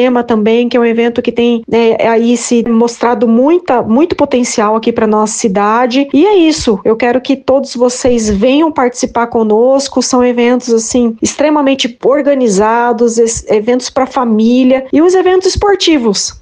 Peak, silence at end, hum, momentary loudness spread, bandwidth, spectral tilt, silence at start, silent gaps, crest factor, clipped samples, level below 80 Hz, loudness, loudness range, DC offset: 0 dBFS; 0.1 s; none; 4 LU; 10 kHz; -4 dB/octave; 0 s; none; 10 dB; under 0.1%; -38 dBFS; -10 LUFS; 1 LU; under 0.1%